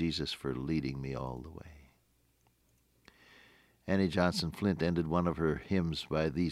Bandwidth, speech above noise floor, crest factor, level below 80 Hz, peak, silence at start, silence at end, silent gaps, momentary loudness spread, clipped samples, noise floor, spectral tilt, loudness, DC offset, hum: 14.5 kHz; 39 dB; 22 dB; -56 dBFS; -14 dBFS; 0 s; 0 s; none; 11 LU; under 0.1%; -72 dBFS; -6.5 dB/octave; -33 LUFS; under 0.1%; none